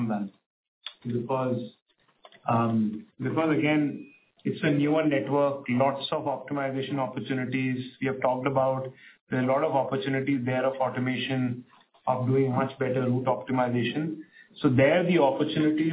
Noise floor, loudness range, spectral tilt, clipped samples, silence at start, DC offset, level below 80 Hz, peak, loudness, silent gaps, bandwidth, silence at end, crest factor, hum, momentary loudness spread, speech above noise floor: -57 dBFS; 3 LU; -11 dB/octave; under 0.1%; 0 s; under 0.1%; -68 dBFS; -10 dBFS; -27 LUFS; 0.46-0.81 s, 1.82-1.86 s, 9.21-9.27 s; 4 kHz; 0 s; 18 dB; none; 10 LU; 31 dB